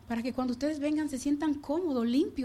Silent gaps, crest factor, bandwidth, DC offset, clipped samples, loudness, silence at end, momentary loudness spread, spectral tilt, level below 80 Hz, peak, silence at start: none; 12 dB; 14 kHz; under 0.1%; under 0.1%; -31 LUFS; 0 s; 3 LU; -5 dB/octave; -58 dBFS; -18 dBFS; 0.05 s